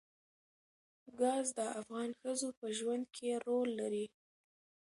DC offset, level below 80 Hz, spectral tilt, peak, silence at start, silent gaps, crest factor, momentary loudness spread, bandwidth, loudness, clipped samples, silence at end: under 0.1%; -88 dBFS; -3 dB/octave; -22 dBFS; 1.05 s; 2.57-2.62 s; 18 dB; 7 LU; 11.5 kHz; -39 LUFS; under 0.1%; 0.8 s